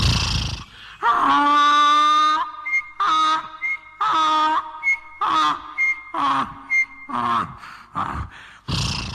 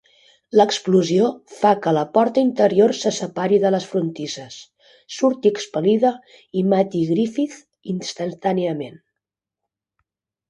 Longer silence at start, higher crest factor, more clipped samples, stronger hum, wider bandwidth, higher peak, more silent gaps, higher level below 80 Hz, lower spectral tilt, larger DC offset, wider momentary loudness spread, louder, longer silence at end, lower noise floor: second, 0 s vs 0.55 s; about the same, 14 dB vs 18 dB; neither; neither; first, 13.5 kHz vs 9.8 kHz; second, -8 dBFS vs -2 dBFS; neither; first, -38 dBFS vs -66 dBFS; second, -3.5 dB/octave vs -5.5 dB/octave; neither; about the same, 14 LU vs 13 LU; about the same, -20 LUFS vs -20 LUFS; second, 0 s vs 1.55 s; second, -39 dBFS vs -85 dBFS